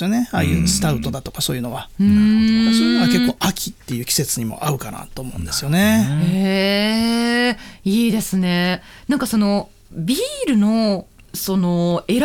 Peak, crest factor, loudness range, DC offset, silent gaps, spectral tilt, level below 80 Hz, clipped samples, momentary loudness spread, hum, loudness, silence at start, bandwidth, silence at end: -4 dBFS; 14 dB; 3 LU; under 0.1%; none; -5 dB/octave; -40 dBFS; under 0.1%; 12 LU; none; -18 LUFS; 0 s; 19 kHz; 0 s